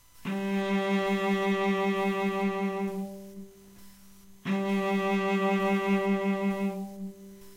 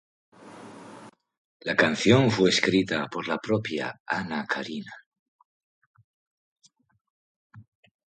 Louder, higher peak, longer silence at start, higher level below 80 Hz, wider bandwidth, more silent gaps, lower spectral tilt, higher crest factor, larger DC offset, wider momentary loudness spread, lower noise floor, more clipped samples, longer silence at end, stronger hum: second, -28 LUFS vs -25 LUFS; second, -16 dBFS vs -6 dBFS; second, 0.15 s vs 0.45 s; about the same, -66 dBFS vs -62 dBFS; first, 16 kHz vs 11 kHz; second, none vs 1.38-1.60 s, 4.00-4.06 s, 5.06-5.12 s, 5.19-5.39 s, 5.45-5.94 s, 6.04-6.56 s, 7.01-7.50 s; first, -6.5 dB/octave vs -5 dB/octave; second, 14 dB vs 24 dB; neither; second, 14 LU vs 25 LU; first, -55 dBFS vs -49 dBFS; neither; second, 0 s vs 0.55 s; neither